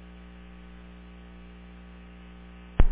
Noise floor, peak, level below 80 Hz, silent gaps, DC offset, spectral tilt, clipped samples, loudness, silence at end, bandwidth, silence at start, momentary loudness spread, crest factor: -46 dBFS; -6 dBFS; -32 dBFS; none; under 0.1%; -7 dB/octave; under 0.1%; -42 LUFS; 0 s; 3.6 kHz; 2.8 s; 10 LU; 22 dB